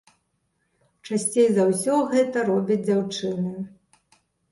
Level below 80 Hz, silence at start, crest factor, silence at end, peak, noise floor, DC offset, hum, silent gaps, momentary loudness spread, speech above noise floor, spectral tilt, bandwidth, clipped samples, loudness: -68 dBFS; 1.05 s; 16 dB; 0.85 s; -8 dBFS; -72 dBFS; under 0.1%; none; none; 10 LU; 50 dB; -5 dB/octave; 12 kHz; under 0.1%; -23 LUFS